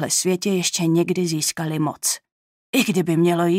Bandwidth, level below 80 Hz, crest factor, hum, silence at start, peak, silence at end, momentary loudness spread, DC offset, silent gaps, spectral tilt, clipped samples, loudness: 16 kHz; -68 dBFS; 16 dB; none; 0 s; -4 dBFS; 0 s; 5 LU; under 0.1%; 2.32-2.73 s; -4 dB/octave; under 0.1%; -21 LUFS